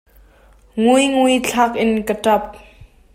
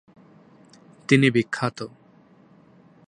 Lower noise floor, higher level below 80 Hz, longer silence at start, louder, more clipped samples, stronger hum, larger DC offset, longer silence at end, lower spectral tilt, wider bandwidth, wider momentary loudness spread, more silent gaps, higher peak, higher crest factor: second, -49 dBFS vs -54 dBFS; first, -48 dBFS vs -66 dBFS; second, 0.75 s vs 1.1 s; first, -16 LUFS vs -21 LUFS; neither; neither; neither; second, 0.3 s vs 1.2 s; second, -4 dB/octave vs -6 dB/octave; first, 16 kHz vs 10.5 kHz; second, 6 LU vs 21 LU; neither; about the same, -2 dBFS vs -4 dBFS; second, 16 dB vs 24 dB